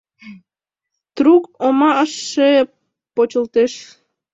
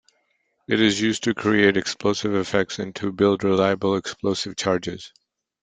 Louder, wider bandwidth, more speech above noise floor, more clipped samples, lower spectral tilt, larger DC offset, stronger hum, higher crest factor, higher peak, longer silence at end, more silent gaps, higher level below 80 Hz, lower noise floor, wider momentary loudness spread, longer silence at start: first, -16 LUFS vs -22 LUFS; second, 8 kHz vs 9.4 kHz; first, 70 dB vs 48 dB; neither; about the same, -3.5 dB/octave vs -4.5 dB/octave; neither; neither; about the same, 16 dB vs 20 dB; about the same, -2 dBFS vs -4 dBFS; about the same, 0.5 s vs 0.55 s; neither; second, -64 dBFS vs -58 dBFS; first, -84 dBFS vs -70 dBFS; about the same, 11 LU vs 9 LU; second, 0.25 s vs 0.7 s